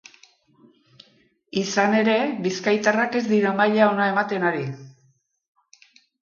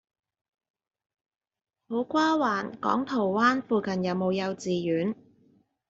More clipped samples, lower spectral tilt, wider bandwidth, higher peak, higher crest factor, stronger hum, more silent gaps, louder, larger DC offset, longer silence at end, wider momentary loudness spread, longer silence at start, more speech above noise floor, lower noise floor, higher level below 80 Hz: neither; about the same, -5 dB/octave vs -4.5 dB/octave; about the same, 7.2 kHz vs 7.6 kHz; first, -6 dBFS vs -10 dBFS; about the same, 18 dB vs 20 dB; neither; neither; first, -21 LUFS vs -27 LUFS; neither; first, 1.3 s vs 0.75 s; about the same, 10 LU vs 8 LU; second, 1.55 s vs 1.9 s; first, 43 dB vs 38 dB; about the same, -64 dBFS vs -64 dBFS; about the same, -70 dBFS vs -70 dBFS